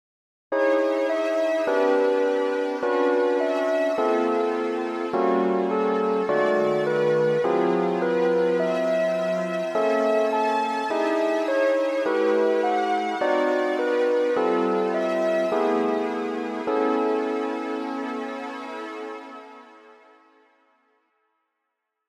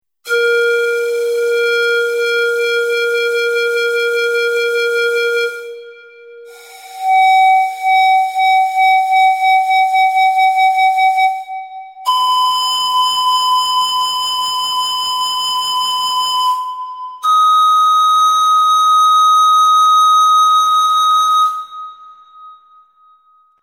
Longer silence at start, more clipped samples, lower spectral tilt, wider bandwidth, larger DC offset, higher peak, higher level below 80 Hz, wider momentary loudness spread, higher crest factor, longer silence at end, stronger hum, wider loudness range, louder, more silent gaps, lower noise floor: first, 0.5 s vs 0.25 s; neither; first, -6 dB/octave vs 2 dB/octave; second, 12.5 kHz vs 18 kHz; neither; second, -10 dBFS vs -4 dBFS; second, -80 dBFS vs -64 dBFS; about the same, 7 LU vs 9 LU; about the same, 14 dB vs 10 dB; first, 2.45 s vs 1.1 s; neither; about the same, 8 LU vs 6 LU; second, -23 LUFS vs -12 LUFS; neither; first, -80 dBFS vs -52 dBFS